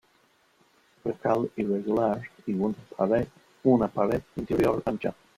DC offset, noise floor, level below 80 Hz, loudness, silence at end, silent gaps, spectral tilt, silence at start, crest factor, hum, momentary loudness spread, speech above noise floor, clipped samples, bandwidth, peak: under 0.1%; -65 dBFS; -56 dBFS; -28 LUFS; 0.25 s; none; -8.5 dB/octave; 1.05 s; 20 dB; none; 9 LU; 38 dB; under 0.1%; 15.5 kHz; -8 dBFS